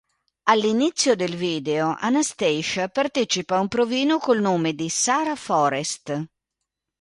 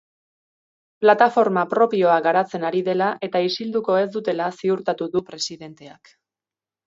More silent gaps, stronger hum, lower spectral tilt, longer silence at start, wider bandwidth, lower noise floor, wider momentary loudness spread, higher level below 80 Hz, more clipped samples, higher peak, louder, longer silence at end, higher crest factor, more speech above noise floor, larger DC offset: neither; neither; second, -3.5 dB/octave vs -5 dB/octave; second, 0.45 s vs 1 s; first, 11.5 kHz vs 7.8 kHz; second, -83 dBFS vs under -90 dBFS; second, 6 LU vs 10 LU; first, -64 dBFS vs -70 dBFS; neither; about the same, -2 dBFS vs -2 dBFS; about the same, -22 LUFS vs -20 LUFS; second, 0.75 s vs 0.95 s; about the same, 20 dB vs 20 dB; second, 61 dB vs over 70 dB; neither